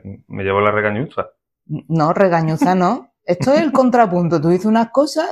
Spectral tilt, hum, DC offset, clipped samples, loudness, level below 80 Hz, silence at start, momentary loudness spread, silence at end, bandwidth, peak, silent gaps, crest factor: -7 dB/octave; none; under 0.1%; under 0.1%; -16 LUFS; -54 dBFS; 0.05 s; 12 LU; 0 s; 13 kHz; 0 dBFS; none; 16 dB